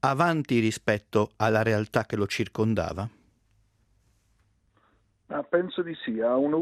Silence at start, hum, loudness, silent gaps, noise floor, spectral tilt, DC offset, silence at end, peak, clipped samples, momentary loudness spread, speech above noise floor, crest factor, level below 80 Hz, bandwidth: 0.05 s; none; -27 LUFS; none; -67 dBFS; -6 dB/octave; under 0.1%; 0 s; -8 dBFS; under 0.1%; 9 LU; 41 dB; 20 dB; -60 dBFS; 14.5 kHz